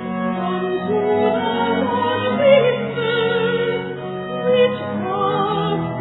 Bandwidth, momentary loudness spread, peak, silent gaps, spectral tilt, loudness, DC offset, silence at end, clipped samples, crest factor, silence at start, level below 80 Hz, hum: 4.1 kHz; 9 LU; -2 dBFS; none; -10 dB/octave; -19 LUFS; under 0.1%; 0 s; under 0.1%; 16 dB; 0 s; -58 dBFS; none